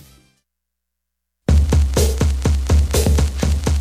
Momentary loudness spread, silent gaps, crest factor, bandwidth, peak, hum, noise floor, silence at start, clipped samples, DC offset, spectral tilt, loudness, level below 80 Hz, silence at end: 4 LU; none; 12 dB; 15.5 kHz; -4 dBFS; 60 Hz at -45 dBFS; -80 dBFS; 1.5 s; under 0.1%; under 0.1%; -5.5 dB/octave; -18 LUFS; -18 dBFS; 0 s